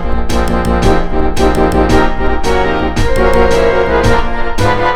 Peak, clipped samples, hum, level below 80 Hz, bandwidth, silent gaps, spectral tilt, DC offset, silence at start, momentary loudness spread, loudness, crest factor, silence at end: 0 dBFS; 0.1%; none; -16 dBFS; 13.5 kHz; none; -6 dB/octave; under 0.1%; 0 s; 5 LU; -12 LUFS; 10 dB; 0 s